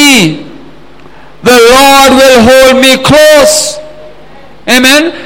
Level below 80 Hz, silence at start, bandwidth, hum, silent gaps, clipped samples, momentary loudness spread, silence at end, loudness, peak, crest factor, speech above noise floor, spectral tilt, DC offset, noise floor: -32 dBFS; 0 s; over 20 kHz; none; none; 5%; 12 LU; 0 s; -3 LUFS; 0 dBFS; 6 dB; 30 dB; -2.5 dB/octave; 3%; -34 dBFS